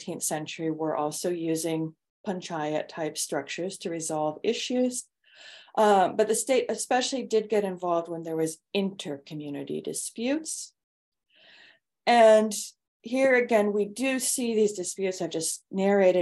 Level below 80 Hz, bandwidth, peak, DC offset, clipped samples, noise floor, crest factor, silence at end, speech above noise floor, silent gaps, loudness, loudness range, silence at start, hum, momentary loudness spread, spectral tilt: -78 dBFS; 13.5 kHz; -8 dBFS; under 0.1%; under 0.1%; -58 dBFS; 20 dB; 0 s; 32 dB; 2.10-2.24 s, 10.84-11.12 s, 12.88-13.00 s; -27 LUFS; 7 LU; 0 s; none; 13 LU; -3.5 dB/octave